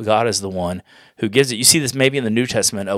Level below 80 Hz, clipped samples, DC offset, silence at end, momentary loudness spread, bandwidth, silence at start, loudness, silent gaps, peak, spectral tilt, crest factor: -56 dBFS; under 0.1%; under 0.1%; 0 s; 13 LU; over 20 kHz; 0 s; -17 LUFS; none; 0 dBFS; -3 dB/octave; 18 dB